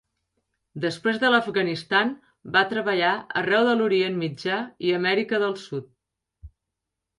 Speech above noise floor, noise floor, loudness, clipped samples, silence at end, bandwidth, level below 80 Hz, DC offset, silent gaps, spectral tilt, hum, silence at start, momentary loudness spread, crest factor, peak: 60 dB; -84 dBFS; -23 LUFS; under 0.1%; 0.7 s; 11.5 kHz; -60 dBFS; under 0.1%; none; -5.5 dB/octave; none; 0.75 s; 10 LU; 20 dB; -6 dBFS